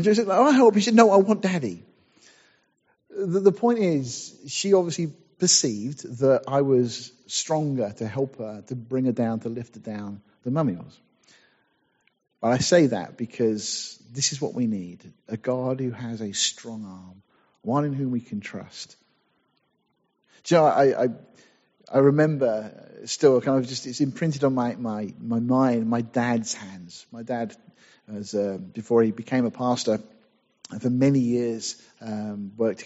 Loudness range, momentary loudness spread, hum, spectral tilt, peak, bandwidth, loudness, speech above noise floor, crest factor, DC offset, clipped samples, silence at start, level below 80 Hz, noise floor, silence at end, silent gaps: 7 LU; 18 LU; none; -5.5 dB/octave; -2 dBFS; 8 kHz; -23 LUFS; 48 dB; 22 dB; under 0.1%; under 0.1%; 0 s; -68 dBFS; -72 dBFS; 0 s; none